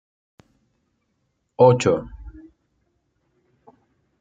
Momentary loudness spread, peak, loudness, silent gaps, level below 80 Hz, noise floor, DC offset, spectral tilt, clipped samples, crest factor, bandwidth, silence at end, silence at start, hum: 27 LU; -2 dBFS; -18 LUFS; none; -50 dBFS; -72 dBFS; under 0.1%; -6.5 dB/octave; under 0.1%; 22 dB; 9 kHz; 1.9 s; 1.6 s; none